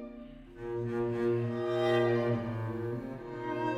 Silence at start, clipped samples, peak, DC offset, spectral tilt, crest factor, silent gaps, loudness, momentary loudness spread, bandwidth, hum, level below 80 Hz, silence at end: 0 s; under 0.1%; -16 dBFS; under 0.1%; -8 dB/octave; 16 dB; none; -33 LUFS; 16 LU; 8.4 kHz; none; -58 dBFS; 0 s